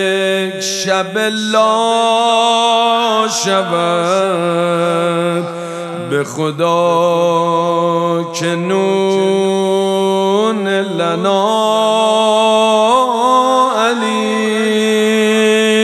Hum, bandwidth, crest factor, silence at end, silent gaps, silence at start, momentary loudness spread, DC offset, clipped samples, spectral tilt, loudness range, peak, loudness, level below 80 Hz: none; 14 kHz; 12 dB; 0 s; none; 0 s; 6 LU; under 0.1%; under 0.1%; -4 dB/octave; 3 LU; 0 dBFS; -13 LUFS; -68 dBFS